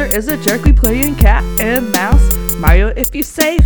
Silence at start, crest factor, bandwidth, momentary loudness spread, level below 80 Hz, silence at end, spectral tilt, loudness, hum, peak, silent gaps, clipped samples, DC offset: 0 s; 12 dB; 20 kHz; 4 LU; -14 dBFS; 0 s; -5 dB/octave; -13 LUFS; none; 0 dBFS; none; 0.3%; 1%